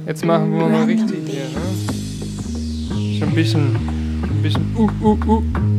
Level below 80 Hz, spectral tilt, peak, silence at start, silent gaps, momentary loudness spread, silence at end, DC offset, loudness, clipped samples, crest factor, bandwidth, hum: -30 dBFS; -7 dB/octave; -2 dBFS; 0 s; none; 9 LU; 0 s; under 0.1%; -19 LUFS; under 0.1%; 16 dB; 13.5 kHz; none